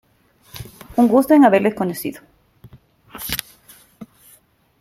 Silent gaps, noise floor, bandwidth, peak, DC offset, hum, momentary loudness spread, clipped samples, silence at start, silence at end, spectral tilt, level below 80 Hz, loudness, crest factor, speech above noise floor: none; -55 dBFS; 16.5 kHz; 0 dBFS; under 0.1%; none; 25 LU; under 0.1%; 0.55 s; 0.75 s; -5.5 dB/octave; -52 dBFS; -17 LUFS; 20 dB; 41 dB